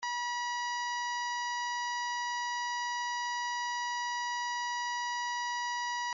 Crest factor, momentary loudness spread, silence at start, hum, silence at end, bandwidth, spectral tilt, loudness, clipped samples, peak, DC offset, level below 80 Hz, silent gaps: 8 dB; 0 LU; 0 s; none; 0 s; 7.4 kHz; 5 dB/octave; -34 LUFS; under 0.1%; -28 dBFS; under 0.1%; -88 dBFS; none